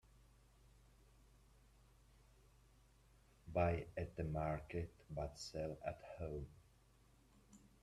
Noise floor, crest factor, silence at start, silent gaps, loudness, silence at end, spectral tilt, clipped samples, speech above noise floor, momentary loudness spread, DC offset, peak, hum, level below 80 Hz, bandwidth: -71 dBFS; 24 dB; 0.15 s; none; -45 LUFS; 0.15 s; -6.5 dB/octave; under 0.1%; 26 dB; 11 LU; under 0.1%; -24 dBFS; none; -62 dBFS; 13 kHz